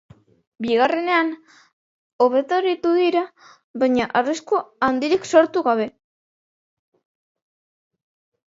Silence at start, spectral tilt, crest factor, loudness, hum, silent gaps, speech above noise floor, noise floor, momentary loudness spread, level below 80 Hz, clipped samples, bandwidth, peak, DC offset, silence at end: 0.6 s; -4 dB/octave; 20 dB; -20 LUFS; none; 1.73-2.19 s, 3.64-3.74 s; over 70 dB; under -90 dBFS; 10 LU; -64 dBFS; under 0.1%; 8 kHz; -2 dBFS; under 0.1%; 2.65 s